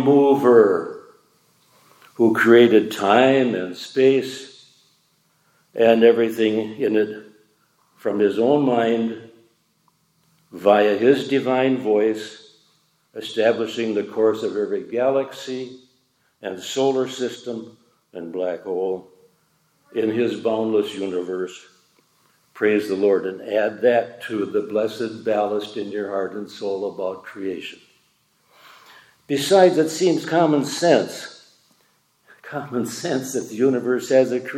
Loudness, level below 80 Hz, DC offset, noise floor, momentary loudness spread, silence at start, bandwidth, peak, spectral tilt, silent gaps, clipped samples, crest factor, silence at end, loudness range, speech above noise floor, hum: -20 LUFS; -76 dBFS; under 0.1%; -64 dBFS; 17 LU; 0 s; 15.5 kHz; -2 dBFS; -5 dB/octave; none; under 0.1%; 20 dB; 0 s; 9 LU; 45 dB; none